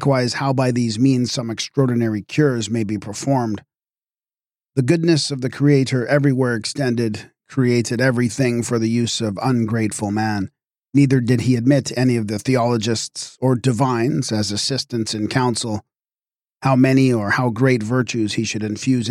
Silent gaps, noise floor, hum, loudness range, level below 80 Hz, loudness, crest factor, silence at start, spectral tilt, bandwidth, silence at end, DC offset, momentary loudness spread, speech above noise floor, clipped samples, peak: none; under -90 dBFS; none; 3 LU; -58 dBFS; -19 LUFS; 16 dB; 0 s; -5.5 dB/octave; 14 kHz; 0 s; under 0.1%; 7 LU; over 72 dB; under 0.1%; -4 dBFS